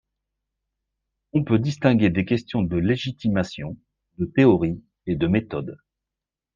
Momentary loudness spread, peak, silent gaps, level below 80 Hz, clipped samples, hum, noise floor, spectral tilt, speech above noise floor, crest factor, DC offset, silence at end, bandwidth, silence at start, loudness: 15 LU; -4 dBFS; none; -50 dBFS; under 0.1%; none; -88 dBFS; -8 dB/octave; 66 dB; 20 dB; under 0.1%; 0.8 s; 7.4 kHz; 1.35 s; -22 LUFS